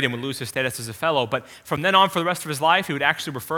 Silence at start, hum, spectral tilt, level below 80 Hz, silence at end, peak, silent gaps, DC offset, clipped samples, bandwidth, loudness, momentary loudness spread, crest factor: 0 s; none; -3.5 dB/octave; -60 dBFS; 0 s; -2 dBFS; none; under 0.1%; under 0.1%; 19 kHz; -22 LUFS; 10 LU; 20 dB